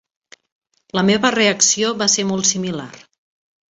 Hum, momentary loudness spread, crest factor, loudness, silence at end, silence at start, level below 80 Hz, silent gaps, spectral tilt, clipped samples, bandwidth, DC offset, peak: none; 12 LU; 18 dB; -16 LUFS; 0.75 s; 0.95 s; -60 dBFS; none; -2.5 dB/octave; under 0.1%; 8 kHz; under 0.1%; -2 dBFS